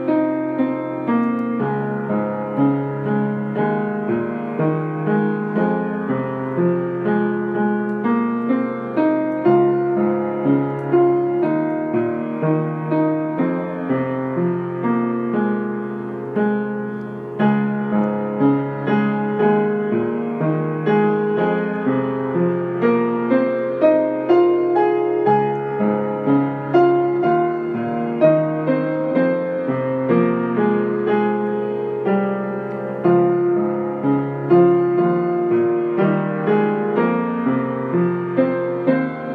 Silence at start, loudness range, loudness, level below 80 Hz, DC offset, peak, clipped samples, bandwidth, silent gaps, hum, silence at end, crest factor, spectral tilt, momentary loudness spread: 0 s; 4 LU; -19 LUFS; -66 dBFS; under 0.1%; -4 dBFS; under 0.1%; 4.6 kHz; none; none; 0 s; 16 dB; -10.5 dB/octave; 6 LU